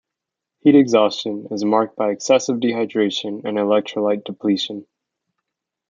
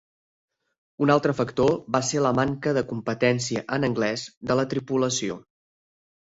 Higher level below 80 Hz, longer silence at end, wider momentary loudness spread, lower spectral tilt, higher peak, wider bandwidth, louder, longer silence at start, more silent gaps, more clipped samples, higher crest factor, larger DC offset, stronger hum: second, -70 dBFS vs -58 dBFS; first, 1.05 s vs 0.8 s; first, 10 LU vs 6 LU; about the same, -5 dB/octave vs -5 dB/octave; first, -2 dBFS vs -6 dBFS; about the same, 7.6 kHz vs 8 kHz; first, -19 LUFS vs -24 LUFS; second, 0.65 s vs 1 s; second, none vs 4.37-4.41 s; neither; about the same, 18 dB vs 20 dB; neither; neither